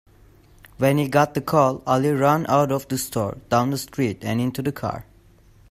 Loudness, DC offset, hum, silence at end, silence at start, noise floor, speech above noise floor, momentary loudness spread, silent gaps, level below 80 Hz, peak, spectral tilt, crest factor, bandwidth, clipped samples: -22 LUFS; under 0.1%; none; 0.7 s; 0.8 s; -52 dBFS; 31 dB; 8 LU; none; -52 dBFS; -4 dBFS; -6 dB/octave; 20 dB; 16 kHz; under 0.1%